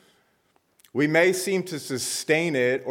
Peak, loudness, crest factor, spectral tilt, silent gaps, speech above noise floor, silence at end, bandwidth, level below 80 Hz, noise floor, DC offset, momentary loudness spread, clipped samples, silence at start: -8 dBFS; -24 LUFS; 18 dB; -4 dB/octave; none; 43 dB; 0 s; 17.5 kHz; -74 dBFS; -67 dBFS; under 0.1%; 9 LU; under 0.1%; 0.95 s